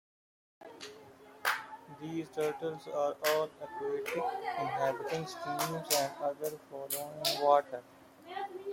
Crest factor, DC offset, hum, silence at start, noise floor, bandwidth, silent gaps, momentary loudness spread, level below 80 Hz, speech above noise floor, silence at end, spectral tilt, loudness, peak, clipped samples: 22 dB; under 0.1%; none; 0.6 s; -55 dBFS; 16.5 kHz; none; 16 LU; -78 dBFS; 21 dB; 0 s; -3 dB/octave; -34 LUFS; -12 dBFS; under 0.1%